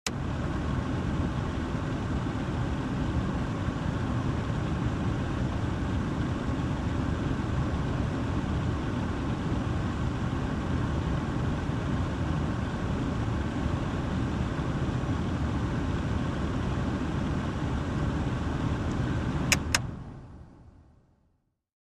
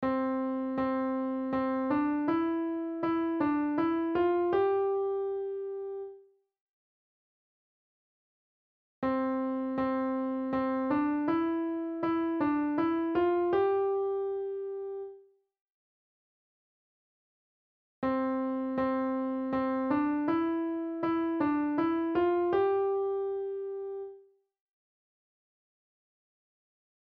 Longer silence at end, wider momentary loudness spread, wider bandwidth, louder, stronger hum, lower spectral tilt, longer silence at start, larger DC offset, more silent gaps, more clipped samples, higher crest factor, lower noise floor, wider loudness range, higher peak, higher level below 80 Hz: second, 1 s vs 2.8 s; second, 1 LU vs 9 LU; first, 13 kHz vs 5 kHz; about the same, -30 LUFS vs -31 LUFS; neither; second, -6 dB/octave vs -9 dB/octave; about the same, 0.05 s vs 0 s; neither; second, none vs 6.61-9.02 s, 15.61-18.02 s; neither; first, 26 dB vs 14 dB; first, -72 dBFS vs -58 dBFS; second, 1 LU vs 12 LU; first, -4 dBFS vs -18 dBFS; first, -38 dBFS vs -66 dBFS